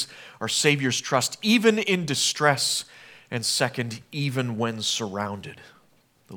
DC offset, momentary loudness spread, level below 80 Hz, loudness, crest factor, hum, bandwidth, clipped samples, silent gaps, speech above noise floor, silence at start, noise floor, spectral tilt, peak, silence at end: under 0.1%; 13 LU; -72 dBFS; -24 LUFS; 22 dB; none; 19.5 kHz; under 0.1%; none; 37 dB; 0 s; -62 dBFS; -3.5 dB/octave; -2 dBFS; 0 s